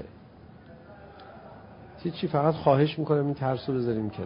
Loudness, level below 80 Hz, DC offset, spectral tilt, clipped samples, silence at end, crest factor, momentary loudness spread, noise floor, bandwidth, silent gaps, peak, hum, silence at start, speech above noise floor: -27 LUFS; -56 dBFS; under 0.1%; -11.5 dB/octave; under 0.1%; 0 s; 20 dB; 25 LU; -50 dBFS; 5.4 kHz; none; -8 dBFS; none; 0 s; 24 dB